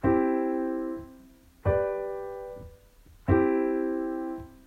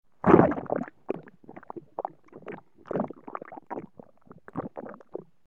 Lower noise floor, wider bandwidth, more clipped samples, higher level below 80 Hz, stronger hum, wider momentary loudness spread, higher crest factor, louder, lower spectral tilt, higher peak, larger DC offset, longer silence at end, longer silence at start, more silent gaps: about the same, -55 dBFS vs -52 dBFS; about the same, 4.4 kHz vs 4 kHz; neither; first, -48 dBFS vs -58 dBFS; neither; second, 16 LU vs 24 LU; second, 20 dB vs 26 dB; about the same, -29 LUFS vs -27 LUFS; about the same, -10 dB/octave vs -10 dB/octave; second, -8 dBFS vs -4 dBFS; second, under 0.1% vs 0.1%; second, 0.1 s vs 0.3 s; second, 0 s vs 0.25 s; neither